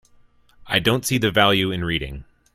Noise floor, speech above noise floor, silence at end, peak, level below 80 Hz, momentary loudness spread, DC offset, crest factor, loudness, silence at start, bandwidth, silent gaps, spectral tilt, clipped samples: -54 dBFS; 34 dB; 0.35 s; 0 dBFS; -44 dBFS; 12 LU; under 0.1%; 22 dB; -20 LUFS; 0.6 s; 16 kHz; none; -4 dB/octave; under 0.1%